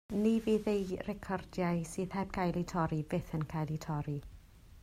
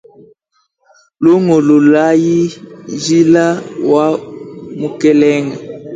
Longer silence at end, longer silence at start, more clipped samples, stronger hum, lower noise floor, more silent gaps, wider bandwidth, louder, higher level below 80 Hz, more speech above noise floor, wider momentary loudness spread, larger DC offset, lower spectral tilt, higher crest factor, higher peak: about the same, 0 s vs 0 s; second, 0.1 s vs 1.2 s; neither; neither; second, -55 dBFS vs -62 dBFS; neither; first, 15 kHz vs 9 kHz; second, -35 LUFS vs -12 LUFS; about the same, -54 dBFS vs -56 dBFS; second, 21 dB vs 52 dB; second, 8 LU vs 18 LU; neither; about the same, -7 dB/octave vs -6.5 dB/octave; about the same, 16 dB vs 12 dB; second, -20 dBFS vs 0 dBFS